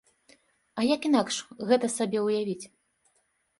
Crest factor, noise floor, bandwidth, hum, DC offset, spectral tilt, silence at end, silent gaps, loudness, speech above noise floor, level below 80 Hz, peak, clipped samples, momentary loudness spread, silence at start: 18 dB; -72 dBFS; 11.5 kHz; none; under 0.1%; -4 dB/octave; 0.95 s; none; -27 LUFS; 46 dB; -74 dBFS; -10 dBFS; under 0.1%; 13 LU; 0.75 s